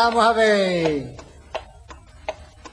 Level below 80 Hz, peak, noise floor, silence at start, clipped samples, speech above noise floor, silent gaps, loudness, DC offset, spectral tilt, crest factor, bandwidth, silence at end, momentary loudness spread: -48 dBFS; -6 dBFS; -44 dBFS; 0 s; under 0.1%; 25 dB; none; -19 LUFS; under 0.1%; -4.5 dB/octave; 16 dB; 10.5 kHz; 0.05 s; 19 LU